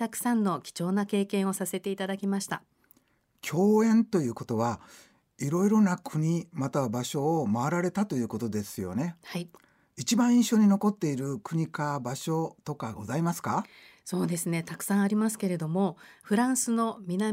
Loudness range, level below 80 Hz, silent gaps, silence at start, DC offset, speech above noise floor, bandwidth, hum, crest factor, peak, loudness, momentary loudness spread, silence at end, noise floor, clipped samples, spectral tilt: 4 LU; -70 dBFS; none; 0 s; under 0.1%; 41 dB; 16 kHz; none; 14 dB; -14 dBFS; -28 LUFS; 12 LU; 0 s; -69 dBFS; under 0.1%; -5.5 dB/octave